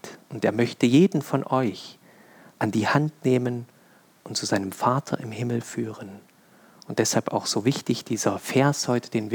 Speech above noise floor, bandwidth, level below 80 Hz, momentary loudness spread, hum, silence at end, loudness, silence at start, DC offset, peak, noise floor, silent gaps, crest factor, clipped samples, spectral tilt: 32 dB; 19.5 kHz; -74 dBFS; 11 LU; none; 0 s; -25 LUFS; 0.05 s; under 0.1%; -6 dBFS; -56 dBFS; none; 18 dB; under 0.1%; -5 dB/octave